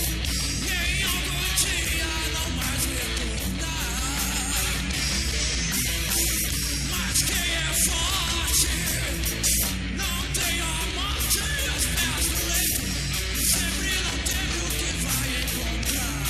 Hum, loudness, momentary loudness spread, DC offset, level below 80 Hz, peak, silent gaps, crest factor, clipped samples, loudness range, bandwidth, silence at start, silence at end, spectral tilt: none; -24 LUFS; 5 LU; under 0.1%; -32 dBFS; -8 dBFS; none; 16 dB; under 0.1%; 3 LU; 16 kHz; 0 s; 0 s; -2 dB/octave